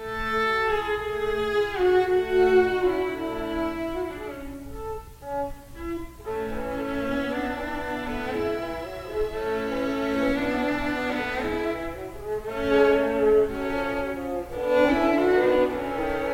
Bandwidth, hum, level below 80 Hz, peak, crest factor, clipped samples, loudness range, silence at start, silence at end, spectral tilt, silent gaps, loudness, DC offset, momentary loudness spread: 16.5 kHz; none; -44 dBFS; -8 dBFS; 18 dB; under 0.1%; 9 LU; 0 s; 0 s; -5.5 dB/octave; none; -25 LUFS; under 0.1%; 14 LU